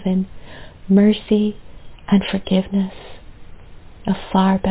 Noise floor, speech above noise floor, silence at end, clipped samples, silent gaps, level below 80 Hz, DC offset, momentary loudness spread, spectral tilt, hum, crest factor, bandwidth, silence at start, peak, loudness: -38 dBFS; 21 dB; 0 s; under 0.1%; none; -42 dBFS; under 0.1%; 25 LU; -11.5 dB/octave; none; 16 dB; 4 kHz; 0 s; -2 dBFS; -19 LUFS